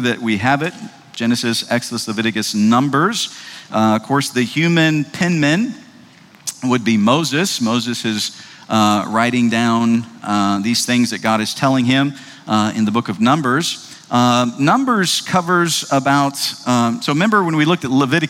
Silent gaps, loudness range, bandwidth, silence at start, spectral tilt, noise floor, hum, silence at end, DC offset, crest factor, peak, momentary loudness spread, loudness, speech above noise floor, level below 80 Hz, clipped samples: none; 2 LU; 16.5 kHz; 0 s; -4.5 dB/octave; -44 dBFS; none; 0 s; under 0.1%; 16 dB; -2 dBFS; 8 LU; -16 LUFS; 28 dB; -62 dBFS; under 0.1%